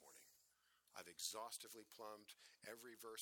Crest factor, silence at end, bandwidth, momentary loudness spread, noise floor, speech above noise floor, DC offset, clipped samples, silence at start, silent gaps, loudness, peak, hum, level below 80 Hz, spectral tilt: 24 dB; 0 s; 19.5 kHz; 14 LU; -80 dBFS; 24 dB; under 0.1%; under 0.1%; 0 s; none; -54 LUFS; -32 dBFS; 60 Hz at -95 dBFS; under -90 dBFS; -0.5 dB/octave